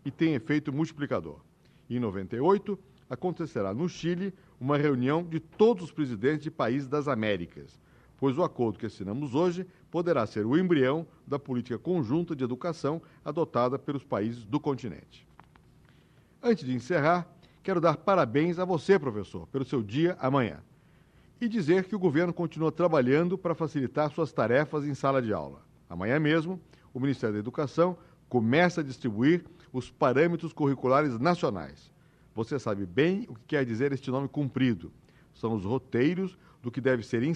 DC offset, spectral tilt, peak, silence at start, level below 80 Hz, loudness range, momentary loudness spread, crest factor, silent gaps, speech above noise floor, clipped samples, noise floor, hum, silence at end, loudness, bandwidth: under 0.1%; -7.5 dB/octave; -10 dBFS; 0.05 s; -64 dBFS; 4 LU; 12 LU; 20 dB; none; 32 dB; under 0.1%; -60 dBFS; none; 0 s; -29 LUFS; 9.8 kHz